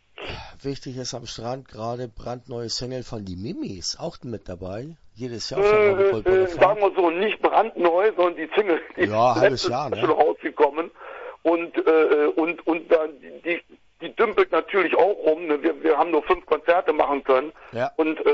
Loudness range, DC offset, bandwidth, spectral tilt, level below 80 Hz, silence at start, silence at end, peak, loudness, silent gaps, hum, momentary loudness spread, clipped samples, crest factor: 11 LU; under 0.1%; 8 kHz; -5 dB/octave; -52 dBFS; 0.2 s; 0 s; -2 dBFS; -22 LUFS; none; none; 15 LU; under 0.1%; 20 dB